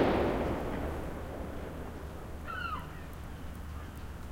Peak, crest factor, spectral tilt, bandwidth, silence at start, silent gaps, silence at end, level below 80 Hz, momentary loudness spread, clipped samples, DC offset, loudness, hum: -16 dBFS; 20 dB; -7 dB/octave; 16.5 kHz; 0 s; none; 0 s; -44 dBFS; 13 LU; under 0.1%; under 0.1%; -38 LUFS; none